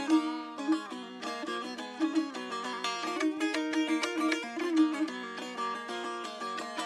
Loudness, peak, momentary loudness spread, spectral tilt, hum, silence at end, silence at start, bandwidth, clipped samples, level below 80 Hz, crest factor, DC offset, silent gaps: -33 LUFS; -16 dBFS; 9 LU; -2.5 dB/octave; none; 0 s; 0 s; 12 kHz; under 0.1%; -86 dBFS; 18 dB; under 0.1%; none